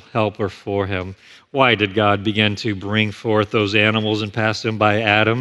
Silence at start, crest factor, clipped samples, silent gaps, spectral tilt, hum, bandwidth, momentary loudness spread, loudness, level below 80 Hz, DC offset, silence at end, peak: 0.15 s; 18 dB; under 0.1%; none; -6 dB/octave; none; 8.6 kHz; 9 LU; -18 LUFS; -56 dBFS; under 0.1%; 0 s; 0 dBFS